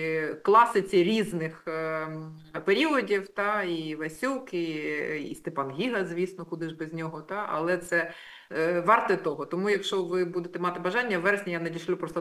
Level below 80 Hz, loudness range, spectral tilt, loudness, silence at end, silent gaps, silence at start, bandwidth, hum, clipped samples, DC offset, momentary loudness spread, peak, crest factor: -70 dBFS; 6 LU; -5.5 dB/octave; -28 LUFS; 0 s; none; 0 s; 15.5 kHz; none; under 0.1%; under 0.1%; 12 LU; -8 dBFS; 20 dB